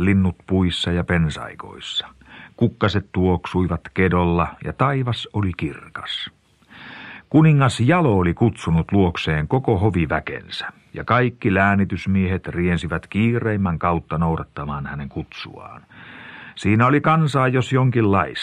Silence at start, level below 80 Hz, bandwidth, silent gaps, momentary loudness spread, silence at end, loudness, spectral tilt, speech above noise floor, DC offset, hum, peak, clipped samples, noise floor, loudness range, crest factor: 0 s; -40 dBFS; 10.5 kHz; none; 16 LU; 0 s; -20 LUFS; -7 dB/octave; 26 dB; under 0.1%; none; 0 dBFS; under 0.1%; -45 dBFS; 5 LU; 20 dB